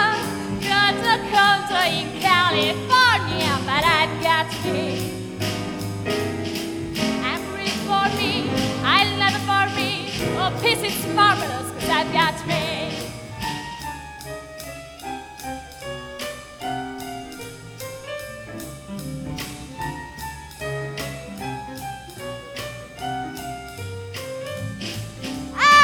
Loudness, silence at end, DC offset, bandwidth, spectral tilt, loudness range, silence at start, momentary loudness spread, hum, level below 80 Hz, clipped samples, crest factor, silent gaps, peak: -22 LUFS; 0 s; under 0.1%; over 20 kHz; -3.5 dB/octave; 14 LU; 0 s; 17 LU; none; -48 dBFS; under 0.1%; 22 dB; none; -2 dBFS